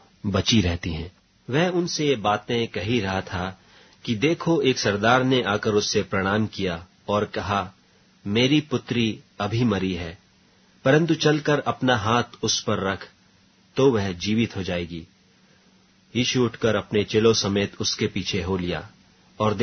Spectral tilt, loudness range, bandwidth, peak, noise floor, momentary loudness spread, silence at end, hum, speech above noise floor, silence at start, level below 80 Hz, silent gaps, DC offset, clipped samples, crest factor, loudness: -5 dB/octave; 3 LU; 6.6 kHz; -4 dBFS; -58 dBFS; 11 LU; 0 s; none; 35 dB; 0.25 s; -50 dBFS; none; under 0.1%; under 0.1%; 20 dB; -23 LUFS